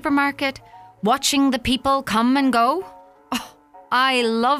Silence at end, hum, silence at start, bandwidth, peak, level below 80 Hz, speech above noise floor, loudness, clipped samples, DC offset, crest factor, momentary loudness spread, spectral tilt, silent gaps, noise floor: 0 s; none; 0.05 s; 16 kHz; -6 dBFS; -48 dBFS; 25 dB; -20 LUFS; under 0.1%; under 0.1%; 14 dB; 11 LU; -3 dB/octave; none; -44 dBFS